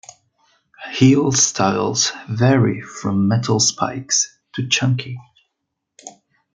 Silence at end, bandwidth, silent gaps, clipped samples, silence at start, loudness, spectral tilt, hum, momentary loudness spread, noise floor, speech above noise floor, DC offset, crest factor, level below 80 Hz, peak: 0.45 s; 9.6 kHz; none; under 0.1%; 0.8 s; -17 LUFS; -4 dB/octave; none; 13 LU; -78 dBFS; 60 dB; under 0.1%; 18 dB; -58 dBFS; 0 dBFS